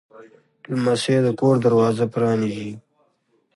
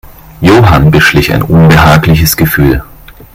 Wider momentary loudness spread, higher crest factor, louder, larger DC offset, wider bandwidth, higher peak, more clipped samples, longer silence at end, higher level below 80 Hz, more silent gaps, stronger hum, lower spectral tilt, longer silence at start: first, 14 LU vs 6 LU; first, 16 dB vs 6 dB; second, -20 LUFS vs -6 LUFS; neither; second, 11.5 kHz vs 16.5 kHz; second, -6 dBFS vs 0 dBFS; second, under 0.1% vs 2%; first, 0.75 s vs 0.25 s; second, -62 dBFS vs -22 dBFS; neither; neither; about the same, -6.5 dB/octave vs -6 dB/octave; second, 0.2 s vs 0.4 s